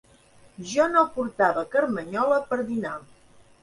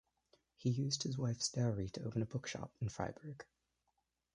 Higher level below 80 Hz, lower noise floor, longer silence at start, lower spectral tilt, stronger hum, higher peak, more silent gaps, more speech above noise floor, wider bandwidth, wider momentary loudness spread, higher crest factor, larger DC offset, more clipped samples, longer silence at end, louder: about the same, -62 dBFS vs -64 dBFS; second, -55 dBFS vs -85 dBFS; about the same, 0.6 s vs 0.6 s; about the same, -5 dB/octave vs -5 dB/octave; neither; first, -6 dBFS vs -22 dBFS; neither; second, 31 dB vs 45 dB; about the same, 11.5 kHz vs 11 kHz; second, 11 LU vs 14 LU; about the same, 20 dB vs 20 dB; neither; neither; second, 0.6 s vs 0.9 s; first, -24 LUFS vs -40 LUFS